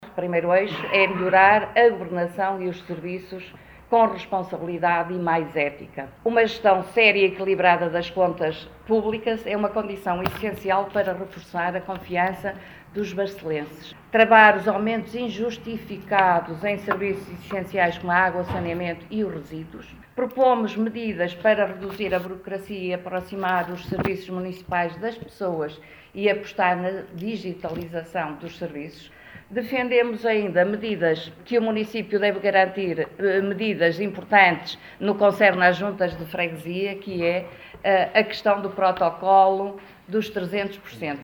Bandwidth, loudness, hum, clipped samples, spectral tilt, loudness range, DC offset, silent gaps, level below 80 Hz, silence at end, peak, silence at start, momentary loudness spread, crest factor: over 20 kHz; -23 LUFS; none; under 0.1%; -6.5 dB/octave; 7 LU; under 0.1%; none; -56 dBFS; 0 s; 0 dBFS; 0 s; 15 LU; 22 dB